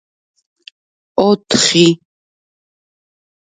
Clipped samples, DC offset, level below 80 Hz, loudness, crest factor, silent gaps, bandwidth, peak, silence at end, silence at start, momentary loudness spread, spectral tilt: under 0.1%; under 0.1%; -58 dBFS; -13 LUFS; 18 dB; none; 9.6 kHz; 0 dBFS; 1.65 s; 1.15 s; 12 LU; -4 dB/octave